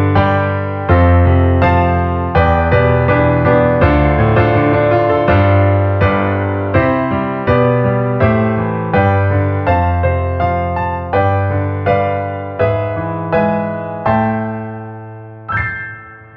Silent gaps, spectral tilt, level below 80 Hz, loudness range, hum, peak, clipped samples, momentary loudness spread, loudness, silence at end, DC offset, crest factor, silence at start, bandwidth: none; -10.5 dB/octave; -28 dBFS; 5 LU; none; 0 dBFS; under 0.1%; 8 LU; -14 LUFS; 0.1 s; under 0.1%; 12 dB; 0 s; 5 kHz